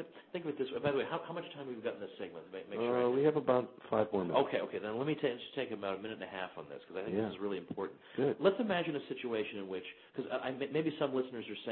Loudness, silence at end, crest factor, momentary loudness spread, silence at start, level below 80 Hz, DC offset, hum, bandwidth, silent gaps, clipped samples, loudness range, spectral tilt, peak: -37 LUFS; 0 s; 22 dB; 13 LU; 0 s; -74 dBFS; under 0.1%; none; 4.3 kHz; none; under 0.1%; 5 LU; -4.5 dB/octave; -16 dBFS